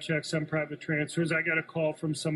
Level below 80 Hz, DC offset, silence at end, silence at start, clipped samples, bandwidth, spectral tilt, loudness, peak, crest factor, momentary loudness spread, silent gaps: -70 dBFS; under 0.1%; 0 s; 0 s; under 0.1%; 12 kHz; -5.5 dB/octave; -30 LUFS; -16 dBFS; 16 dB; 5 LU; none